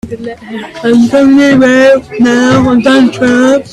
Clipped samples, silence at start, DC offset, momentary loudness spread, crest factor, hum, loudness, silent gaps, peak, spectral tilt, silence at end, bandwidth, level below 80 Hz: under 0.1%; 0.05 s; under 0.1%; 16 LU; 8 dB; none; -7 LUFS; none; 0 dBFS; -5.5 dB/octave; 0 s; 11.5 kHz; -40 dBFS